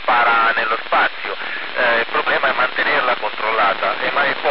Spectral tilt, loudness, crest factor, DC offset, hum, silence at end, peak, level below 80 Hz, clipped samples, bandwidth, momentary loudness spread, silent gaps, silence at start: 1.5 dB/octave; -17 LUFS; 12 dB; 3%; none; 0 s; -6 dBFS; -68 dBFS; under 0.1%; 5.8 kHz; 6 LU; none; 0 s